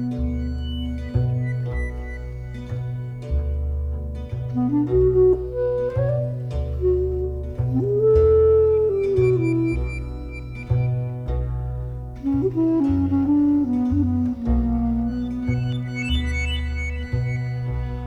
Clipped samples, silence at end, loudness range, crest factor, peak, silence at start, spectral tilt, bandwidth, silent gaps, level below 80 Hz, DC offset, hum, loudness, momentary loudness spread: under 0.1%; 0 s; 8 LU; 14 dB; -6 dBFS; 0 s; -9 dB/octave; 9.4 kHz; none; -30 dBFS; under 0.1%; none; -22 LUFS; 12 LU